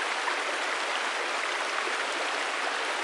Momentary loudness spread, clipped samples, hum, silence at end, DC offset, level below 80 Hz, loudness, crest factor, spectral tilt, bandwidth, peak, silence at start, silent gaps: 0 LU; under 0.1%; none; 0 s; under 0.1%; under -90 dBFS; -29 LUFS; 16 dB; 1.5 dB/octave; 11.5 kHz; -14 dBFS; 0 s; none